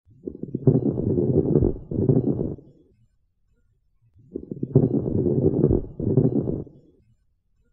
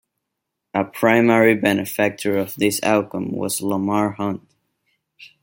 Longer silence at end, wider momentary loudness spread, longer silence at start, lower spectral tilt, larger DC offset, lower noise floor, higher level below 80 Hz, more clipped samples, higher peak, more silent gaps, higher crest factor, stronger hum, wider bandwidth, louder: first, 1.1 s vs 0.15 s; first, 16 LU vs 12 LU; second, 0.25 s vs 0.75 s; first, -15.5 dB/octave vs -5 dB/octave; neither; second, -66 dBFS vs -80 dBFS; first, -40 dBFS vs -62 dBFS; neither; about the same, -4 dBFS vs -2 dBFS; neither; about the same, 20 dB vs 18 dB; neither; second, 1.7 kHz vs 17 kHz; second, -23 LUFS vs -19 LUFS